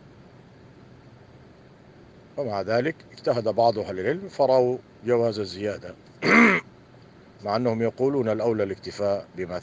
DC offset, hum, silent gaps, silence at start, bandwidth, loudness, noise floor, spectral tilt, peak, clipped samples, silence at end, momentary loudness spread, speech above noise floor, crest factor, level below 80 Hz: under 0.1%; none; none; 1.35 s; 9.4 kHz; -24 LUFS; -50 dBFS; -6 dB/octave; -4 dBFS; under 0.1%; 0 s; 12 LU; 27 dB; 22 dB; -64 dBFS